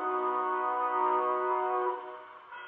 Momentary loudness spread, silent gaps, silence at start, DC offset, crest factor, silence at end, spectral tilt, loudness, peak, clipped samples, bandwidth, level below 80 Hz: 16 LU; none; 0 s; under 0.1%; 14 dB; 0 s; -0.5 dB/octave; -30 LUFS; -18 dBFS; under 0.1%; 3.9 kHz; -88 dBFS